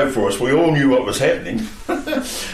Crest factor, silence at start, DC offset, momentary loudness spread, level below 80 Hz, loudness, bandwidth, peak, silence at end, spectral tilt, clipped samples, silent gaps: 12 dB; 0 s; under 0.1%; 10 LU; -40 dBFS; -18 LUFS; 15 kHz; -6 dBFS; 0 s; -5 dB/octave; under 0.1%; none